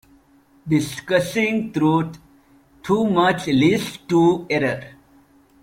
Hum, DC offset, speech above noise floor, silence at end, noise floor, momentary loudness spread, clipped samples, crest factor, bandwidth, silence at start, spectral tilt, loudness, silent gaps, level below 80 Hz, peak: none; under 0.1%; 36 dB; 0.75 s; -55 dBFS; 7 LU; under 0.1%; 18 dB; 16 kHz; 0.65 s; -6 dB/octave; -20 LUFS; none; -56 dBFS; -4 dBFS